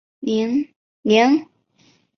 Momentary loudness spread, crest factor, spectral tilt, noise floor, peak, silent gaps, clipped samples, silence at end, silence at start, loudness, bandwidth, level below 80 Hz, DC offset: 12 LU; 20 dB; -5 dB/octave; -59 dBFS; -2 dBFS; 0.76-1.03 s; under 0.1%; 0.75 s; 0.2 s; -19 LUFS; 6.6 kHz; -66 dBFS; under 0.1%